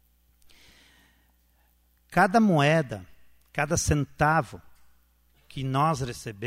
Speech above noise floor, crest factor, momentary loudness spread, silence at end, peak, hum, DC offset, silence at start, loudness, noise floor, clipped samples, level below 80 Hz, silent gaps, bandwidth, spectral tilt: 40 dB; 20 dB; 16 LU; 0 s; -8 dBFS; none; under 0.1%; 2.1 s; -25 LUFS; -65 dBFS; under 0.1%; -48 dBFS; none; 16 kHz; -5.5 dB/octave